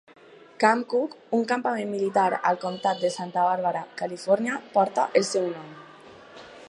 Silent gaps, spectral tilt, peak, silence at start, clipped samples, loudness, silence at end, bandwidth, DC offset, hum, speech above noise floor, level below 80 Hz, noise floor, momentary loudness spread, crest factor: none; -4.5 dB/octave; -4 dBFS; 0.3 s; under 0.1%; -25 LUFS; 0 s; 11.5 kHz; under 0.1%; none; 23 dB; -78 dBFS; -48 dBFS; 10 LU; 22 dB